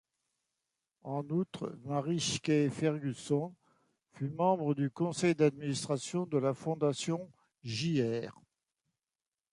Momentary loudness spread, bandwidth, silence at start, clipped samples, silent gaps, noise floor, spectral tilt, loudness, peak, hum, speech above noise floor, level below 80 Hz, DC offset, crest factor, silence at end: 11 LU; 11.5 kHz; 1.05 s; under 0.1%; none; under -90 dBFS; -5.5 dB/octave; -33 LUFS; -16 dBFS; none; over 57 dB; -72 dBFS; under 0.1%; 20 dB; 1.2 s